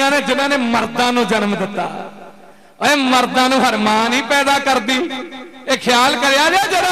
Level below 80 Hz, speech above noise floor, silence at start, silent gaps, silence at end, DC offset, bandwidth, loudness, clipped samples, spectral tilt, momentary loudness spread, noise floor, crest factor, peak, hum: -54 dBFS; 29 dB; 0 s; none; 0 s; 0.4%; 15.5 kHz; -15 LUFS; under 0.1%; -2.5 dB/octave; 11 LU; -44 dBFS; 14 dB; -2 dBFS; none